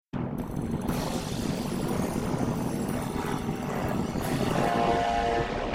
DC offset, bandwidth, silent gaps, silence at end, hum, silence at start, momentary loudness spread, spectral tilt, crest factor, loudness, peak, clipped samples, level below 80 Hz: under 0.1%; 16 kHz; none; 0 s; none; 0.15 s; 6 LU; -6 dB/octave; 16 dB; -29 LUFS; -12 dBFS; under 0.1%; -42 dBFS